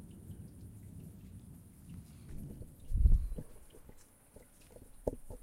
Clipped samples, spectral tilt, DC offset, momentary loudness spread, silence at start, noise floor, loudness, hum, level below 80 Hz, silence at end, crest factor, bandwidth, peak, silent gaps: under 0.1%; -8 dB/octave; under 0.1%; 26 LU; 0 s; -60 dBFS; -40 LUFS; none; -38 dBFS; 0.05 s; 22 dB; 15 kHz; -14 dBFS; none